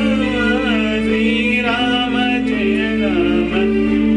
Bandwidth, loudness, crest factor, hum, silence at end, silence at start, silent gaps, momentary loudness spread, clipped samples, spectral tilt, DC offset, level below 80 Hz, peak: 10 kHz; -16 LUFS; 10 dB; none; 0 s; 0 s; none; 1 LU; under 0.1%; -6 dB/octave; under 0.1%; -34 dBFS; -6 dBFS